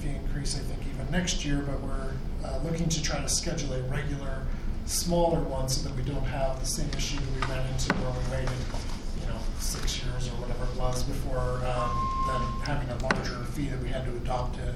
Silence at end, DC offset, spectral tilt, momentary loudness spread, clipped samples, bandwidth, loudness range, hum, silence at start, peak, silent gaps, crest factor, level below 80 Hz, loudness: 0 s; under 0.1%; -4.5 dB/octave; 8 LU; under 0.1%; 14.5 kHz; 3 LU; none; 0 s; -8 dBFS; none; 20 dB; -32 dBFS; -31 LUFS